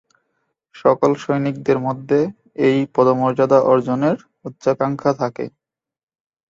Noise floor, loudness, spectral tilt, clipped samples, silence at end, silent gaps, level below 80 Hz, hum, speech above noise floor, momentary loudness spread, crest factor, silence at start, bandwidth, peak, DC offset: -89 dBFS; -18 LUFS; -7.5 dB/octave; under 0.1%; 1 s; none; -60 dBFS; none; 72 dB; 10 LU; 16 dB; 0.75 s; 7.6 kHz; -2 dBFS; under 0.1%